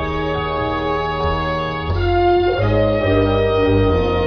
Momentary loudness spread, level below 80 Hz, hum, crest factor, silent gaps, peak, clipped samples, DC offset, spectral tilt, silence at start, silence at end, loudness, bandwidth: 5 LU; -28 dBFS; none; 12 dB; none; -4 dBFS; under 0.1%; under 0.1%; -8.5 dB/octave; 0 s; 0 s; -17 LUFS; 6.4 kHz